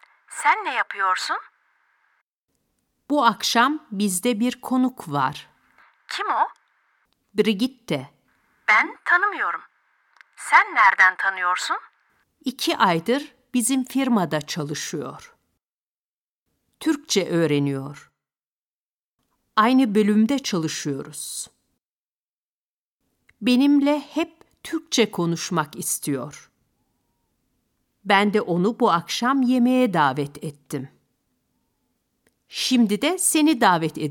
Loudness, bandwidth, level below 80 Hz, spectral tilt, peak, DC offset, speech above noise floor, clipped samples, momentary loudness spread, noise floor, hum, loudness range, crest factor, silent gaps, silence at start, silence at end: -21 LUFS; 18 kHz; -70 dBFS; -4 dB/octave; -2 dBFS; under 0.1%; over 69 dB; under 0.1%; 14 LU; under -90 dBFS; none; 7 LU; 20 dB; 2.21-2.48 s, 15.71-16.46 s, 18.46-19.18 s, 21.83-23.00 s; 0.3 s; 0 s